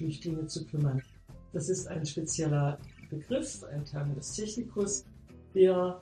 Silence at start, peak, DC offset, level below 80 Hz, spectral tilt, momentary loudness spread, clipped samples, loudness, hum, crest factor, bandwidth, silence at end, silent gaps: 0 s; -12 dBFS; under 0.1%; -58 dBFS; -5.5 dB/octave; 13 LU; under 0.1%; -32 LUFS; none; 20 dB; 10 kHz; 0 s; none